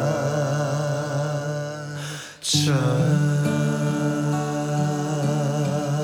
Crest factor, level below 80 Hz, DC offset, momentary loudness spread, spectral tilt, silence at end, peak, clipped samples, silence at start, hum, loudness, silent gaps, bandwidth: 16 dB; -62 dBFS; under 0.1%; 9 LU; -5.5 dB/octave; 0 s; -6 dBFS; under 0.1%; 0 s; none; -23 LUFS; none; 15 kHz